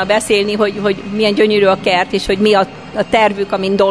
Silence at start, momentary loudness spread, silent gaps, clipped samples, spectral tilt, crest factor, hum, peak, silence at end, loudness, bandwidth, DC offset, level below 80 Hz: 0 s; 6 LU; none; under 0.1%; -4.5 dB/octave; 12 dB; none; 0 dBFS; 0 s; -14 LUFS; 11 kHz; 0.4%; -42 dBFS